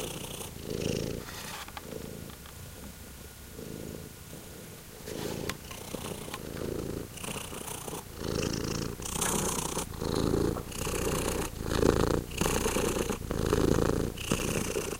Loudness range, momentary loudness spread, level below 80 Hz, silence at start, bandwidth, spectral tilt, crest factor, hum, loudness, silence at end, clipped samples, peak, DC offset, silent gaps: 13 LU; 16 LU; -42 dBFS; 0 s; 17 kHz; -4.5 dB/octave; 26 dB; none; -33 LUFS; 0 s; under 0.1%; -8 dBFS; under 0.1%; none